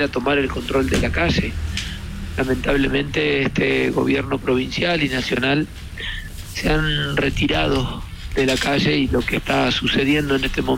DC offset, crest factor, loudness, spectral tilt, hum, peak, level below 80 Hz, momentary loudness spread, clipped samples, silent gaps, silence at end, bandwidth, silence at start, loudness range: under 0.1%; 12 dB; -20 LUFS; -5 dB/octave; none; -8 dBFS; -32 dBFS; 10 LU; under 0.1%; none; 0 s; 16.5 kHz; 0 s; 2 LU